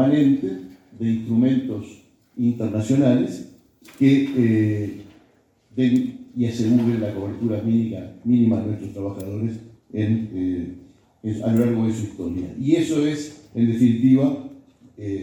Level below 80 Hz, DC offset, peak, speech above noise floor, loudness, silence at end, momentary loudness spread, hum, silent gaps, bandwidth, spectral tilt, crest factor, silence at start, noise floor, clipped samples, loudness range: -58 dBFS; under 0.1%; -6 dBFS; 39 dB; -22 LUFS; 0 s; 14 LU; none; none; 19 kHz; -8 dB/octave; 16 dB; 0 s; -59 dBFS; under 0.1%; 4 LU